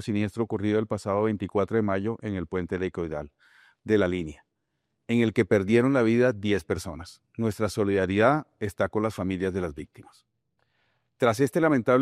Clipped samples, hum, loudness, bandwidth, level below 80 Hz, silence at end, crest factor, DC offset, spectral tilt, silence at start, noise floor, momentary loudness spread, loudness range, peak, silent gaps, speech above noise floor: under 0.1%; none; -26 LUFS; 14.5 kHz; -58 dBFS; 0 s; 20 dB; under 0.1%; -7 dB/octave; 0 s; -79 dBFS; 13 LU; 5 LU; -6 dBFS; none; 53 dB